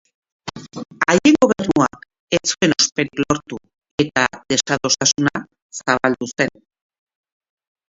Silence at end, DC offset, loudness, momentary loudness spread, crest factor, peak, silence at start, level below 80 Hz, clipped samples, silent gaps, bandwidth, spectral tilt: 1.45 s; under 0.1%; -18 LUFS; 19 LU; 20 dB; 0 dBFS; 0.45 s; -52 dBFS; under 0.1%; 2.20-2.28 s, 3.91-3.98 s, 5.62-5.70 s; 7.8 kHz; -3 dB/octave